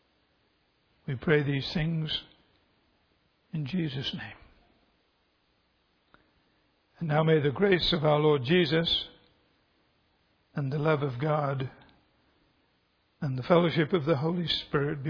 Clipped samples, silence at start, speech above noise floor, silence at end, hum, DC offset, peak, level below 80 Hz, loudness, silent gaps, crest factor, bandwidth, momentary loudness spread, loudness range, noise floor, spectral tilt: under 0.1%; 1.1 s; 44 dB; 0 s; none; under 0.1%; -8 dBFS; -56 dBFS; -28 LUFS; none; 22 dB; 5.4 kHz; 14 LU; 12 LU; -71 dBFS; -7.5 dB/octave